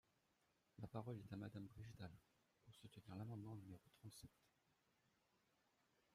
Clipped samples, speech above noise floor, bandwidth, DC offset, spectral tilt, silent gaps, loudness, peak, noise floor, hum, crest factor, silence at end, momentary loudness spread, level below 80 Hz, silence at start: under 0.1%; 28 dB; 15 kHz; under 0.1%; -7 dB/octave; none; -57 LUFS; -36 dBFS; -85 dBFS; none; 24 dB; 1.65 s; 11 LU; -80 dBFS; 0.8 s